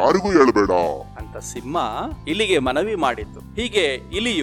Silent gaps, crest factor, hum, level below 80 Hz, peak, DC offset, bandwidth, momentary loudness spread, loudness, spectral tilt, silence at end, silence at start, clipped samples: none; 18 dB; none; -40 dBFS; -2 dBFS; under 0.1%; 15 kHz; 16 LU; -20 LUFS; -4.5 dB/octave; 0 s; 0 s; under 0.1%